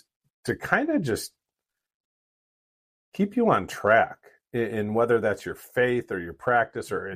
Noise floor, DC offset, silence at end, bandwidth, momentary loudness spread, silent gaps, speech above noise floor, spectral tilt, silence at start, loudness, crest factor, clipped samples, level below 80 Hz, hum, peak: -87 dBFS; under 0.1%; 0 s; 15.5 kHz; 11 LU; 1.94-3.12 s; 62 dB; -6 dB/octave; 0.45 s; -25 LUFS; 22 dB; under 0.1%; -60 dBFS; none; -6 dBFS